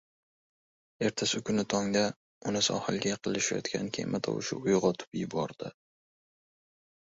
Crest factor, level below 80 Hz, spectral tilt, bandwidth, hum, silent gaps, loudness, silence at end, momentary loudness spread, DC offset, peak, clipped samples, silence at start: 20 dB; -66 dBFS; -4 dB/octave; 8 kHz; none; 2.16-2.41 s, 5.07-5.12 s; -31 LUFS; 1.5 s; 7 LU; under 0.1%; -12 dBFS; under 0.1%; 1 s